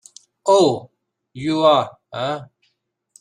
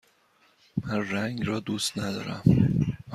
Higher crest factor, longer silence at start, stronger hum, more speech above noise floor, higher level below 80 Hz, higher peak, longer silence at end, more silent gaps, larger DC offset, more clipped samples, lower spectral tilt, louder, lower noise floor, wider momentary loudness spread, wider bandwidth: about the same, 18 dB vs 20 dB; second, 0.45 s vs 0.75 s; neither; first, 53 dB vs 38 dB; second, -64 dBFS vs -48 dBFS; first, -2 dBFS vs -6 dBFS; first, 0.75 s vs 0 s; neither; neither; neither; about the same, -5 dB/octave vs -6 dB/octave; first, -19 LUFS vs -27 LUFS; first, -70 dBFS vs -64 dBFS; first, 14 LU vs 10 LU; second, 10.5 kHz vs 14 kHz